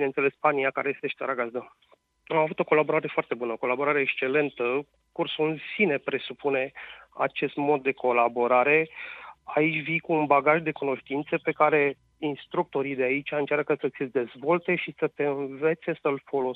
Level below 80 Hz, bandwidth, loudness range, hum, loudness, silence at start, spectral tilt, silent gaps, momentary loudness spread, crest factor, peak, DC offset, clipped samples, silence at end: -72 dBFS; 4.6 kHz; 3 LU; none; -26 LUFS; 0 s; -8.5 dB/octave; none; 9 LU; 20 dB; -6 dBFS; under 0.1%; under 0.1%; 0 s